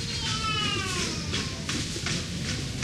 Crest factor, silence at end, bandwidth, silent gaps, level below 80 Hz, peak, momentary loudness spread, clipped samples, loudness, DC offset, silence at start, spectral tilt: 16 dB; 0 s; 15.5 kHz; none; -44 dBFS; -14 dBFS; 5 LU; under 0.1%; -28 LUFS; under 0.1%; 0 s; -3 dB/octave